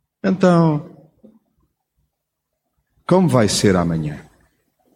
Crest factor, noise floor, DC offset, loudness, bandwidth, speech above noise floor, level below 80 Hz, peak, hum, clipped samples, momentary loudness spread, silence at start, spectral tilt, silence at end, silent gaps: 18 dB; -77 dBFS; under 0.1%; -17 LUFS; 15 kHz; 62 dB; -48 dBFS; -2 dBFS; none; under 0.1%; 14 LU; 0.25 s; -6 dB/octave; 0.75 s; none